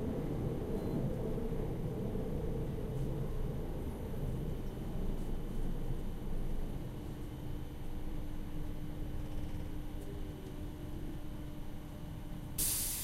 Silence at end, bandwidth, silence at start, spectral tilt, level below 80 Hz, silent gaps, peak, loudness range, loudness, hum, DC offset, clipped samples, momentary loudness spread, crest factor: 0 s; 16 kHz; 0 s; -5.5 dB/octave; -40 dBFS; none; -20 dBFS; 6 LU; -41 LUFS; none; under 0.1%; under 0.1%; 8 LU; 16 dB